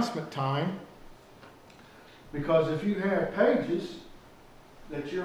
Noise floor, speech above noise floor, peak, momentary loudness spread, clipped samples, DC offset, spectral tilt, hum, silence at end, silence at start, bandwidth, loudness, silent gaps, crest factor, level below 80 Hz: -53 dBFS; 24 dB; -12 dBFS; 17 LU; under 0.1%; under 0.1%; -7 dB/octave; none; 0 s; 0 s; over 20 kHz; -29 LUFS; none; 20 dB; -56 dBFS